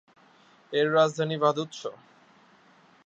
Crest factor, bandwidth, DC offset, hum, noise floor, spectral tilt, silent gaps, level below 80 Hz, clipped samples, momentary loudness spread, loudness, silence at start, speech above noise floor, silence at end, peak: 20 dB; 8.4 kHz; under 0.1%; none; -59 dBFS; -5 dB/octave; none; -80 dBFS; under 0.1%; 15 LU; -26 LUFS; 0.7 s; 33 dB; 1.15 s; -8 dBFS